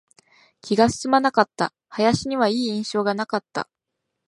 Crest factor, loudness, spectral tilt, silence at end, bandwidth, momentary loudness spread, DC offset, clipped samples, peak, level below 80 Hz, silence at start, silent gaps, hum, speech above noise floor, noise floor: 22 dB; -22 LUFS; -4.5 dB/octave; 0.65 s; 11.5 kHz; 11 LU; under 0.1%; under 0.1%; 0 dBFS; -56 dBFS; 0.65 s; none; none; 59 dB; -80 dBFS